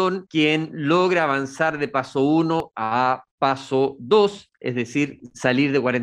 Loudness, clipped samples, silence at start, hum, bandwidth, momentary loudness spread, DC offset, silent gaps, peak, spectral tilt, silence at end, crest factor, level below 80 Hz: -21 LUFS; under 0.1%; 0 s; none; 10.5 kHz; 6 LU; under 0.1%; 3.31-3.38 s; -4 dBFS; -6 dB/octave; 0 s; 18 dB; -62 dBFS